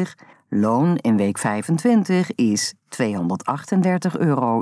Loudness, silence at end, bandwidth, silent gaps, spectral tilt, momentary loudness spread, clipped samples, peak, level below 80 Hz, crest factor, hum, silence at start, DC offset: -20 LUFS; 0 s; 11 kHz; none; -6 dB/octave; 7 LU; under 0.1%; -6 dBFS; -70 dBFS; 12 dB; none; 0 s; under 0.1%